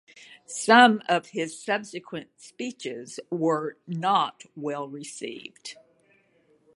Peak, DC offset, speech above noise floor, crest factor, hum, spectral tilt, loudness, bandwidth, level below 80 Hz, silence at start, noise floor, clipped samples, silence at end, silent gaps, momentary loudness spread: -2 dBFS; under 0.1%; 38 dB; 24 dB; none; -3.5 dB/octave; -25 LUFS; 11.5 kHz; -80 dBFS; 0.5 s; -64 dBFS; under 0.1%; 1 s; none; 21 LU